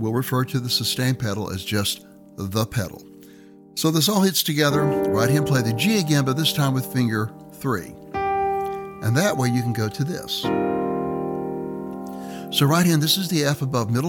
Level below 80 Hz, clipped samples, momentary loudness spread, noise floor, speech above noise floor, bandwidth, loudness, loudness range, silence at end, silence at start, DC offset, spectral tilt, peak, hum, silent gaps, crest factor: -54 dBFS; under 0.1%; 12 LU; -46 dBFS; 25 dB; 19 kHz; -22 LUFS; 5 LU; 0 s; 0 s; under 0.1%; -5 dB/octave; -6 dBFS; none; none; 16 dB